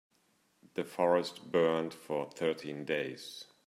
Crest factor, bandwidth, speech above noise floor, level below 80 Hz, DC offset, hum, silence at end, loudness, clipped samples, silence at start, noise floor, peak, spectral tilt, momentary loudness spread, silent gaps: 20 dB; 14.5 kHz; 39 dB; -80 dBFS; under 0.1%; none; 0.25 s; -34 LUFS; under 0.1%; 0.75 s; -73 dBFS; -14 dBFS; -5 dB/octave; 12 LU; none